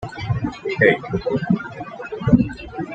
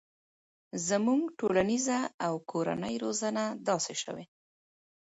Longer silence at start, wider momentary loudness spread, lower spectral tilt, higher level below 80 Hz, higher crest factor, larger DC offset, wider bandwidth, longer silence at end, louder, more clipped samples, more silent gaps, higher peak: second, 0 s vs 0.75 s; first, 14 LU vs 8 LU; first, -8 dB/octave vs -4 dB/octave; first, -40 dBFS vs -68 dBFS; about the same, 20 dB vs 18 dB; neither; about the same, 8 kHz vs 8 kHz; second, 0 s vs 0.8 s; first, -20 LUFS vs -31 LUFS; neither; second, none vs 2.14-2.18 s; first, -2 dBFS vs -14 dBFS